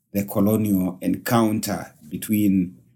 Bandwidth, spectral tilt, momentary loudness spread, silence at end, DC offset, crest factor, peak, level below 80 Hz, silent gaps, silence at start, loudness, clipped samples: 18 kHz; -6.5 dB/octave; 10 LU; 0.25 s; under 0.1%; 16 dB; -6 dBFS; -58 dBFS; none; 0.15 s; -22 LUFS; under 0.1%